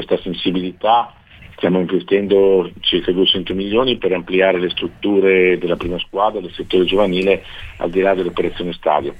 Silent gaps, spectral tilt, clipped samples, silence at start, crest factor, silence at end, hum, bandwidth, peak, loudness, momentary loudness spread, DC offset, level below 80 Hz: none; -7 dB/octave; under 0.1%; 0 s; 16 dB; 0 s; none; 5 kHz; -2 dBFS; -17 LUFS; 8 LU; under 0.1%; -40 dBFS